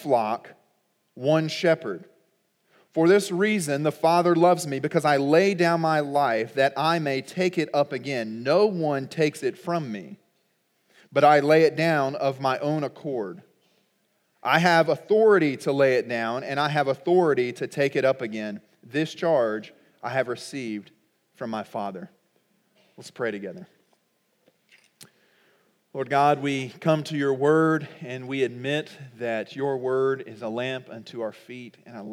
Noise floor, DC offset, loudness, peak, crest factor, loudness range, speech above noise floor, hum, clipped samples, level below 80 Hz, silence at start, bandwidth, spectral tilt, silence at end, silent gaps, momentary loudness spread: -70 dBFS; under 0.1%; -24 LUFS; -4 dBFS; 22 dB; 13 LU; 46 dB; none; under 0.1%; -86 dBFS; 0 s; 16 kHz; -5.5 dB/octave; 0 s; none; 16 LU